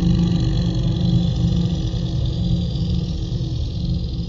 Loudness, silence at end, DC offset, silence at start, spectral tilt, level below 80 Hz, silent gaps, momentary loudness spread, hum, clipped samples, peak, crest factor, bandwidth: -21 LUFS; 0 s; under 0.1%; 0 s; -8 dB/octave; -26 dBFS; none; 6 LU; none; under 0.1%; -6 dBFS; 12 dB; 7.4 kHz